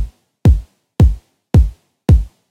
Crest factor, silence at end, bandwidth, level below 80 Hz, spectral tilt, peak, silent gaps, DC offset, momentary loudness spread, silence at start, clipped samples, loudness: 14 dB; 0.25 s; 9.4 kHz; -18 dBFS; -9 dB/octave; 0 dBFS; none; under 0.1%; 15 LU; 0 s; under 0.1%; -15 LUFS